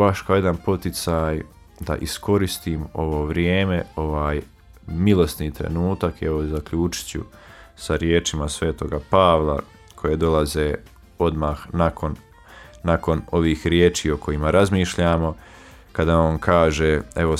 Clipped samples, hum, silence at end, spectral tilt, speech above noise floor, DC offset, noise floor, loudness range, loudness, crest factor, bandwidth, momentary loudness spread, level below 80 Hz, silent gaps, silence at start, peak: under 0.1%; none; 0 s; -6 dB/octave; 24 dB; under 0.1%; -45 dBFS; 4 LU; -21 LUFS; 18 dB; 15.5 kHz; 11 LU; -34 dBFS; none; 0 s; -2 dBFS